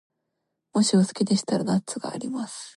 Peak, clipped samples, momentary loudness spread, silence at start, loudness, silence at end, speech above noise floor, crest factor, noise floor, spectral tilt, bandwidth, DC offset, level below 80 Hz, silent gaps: -10 dBFS; under 0.1%; 11 LU; 0.75 s; -25 LUFS; 0.05 s; 56 dB; 16 dB; -80 dBFS; -5 dB/octave; 11.5 kHz; under 0.1%; -68 dBFS; none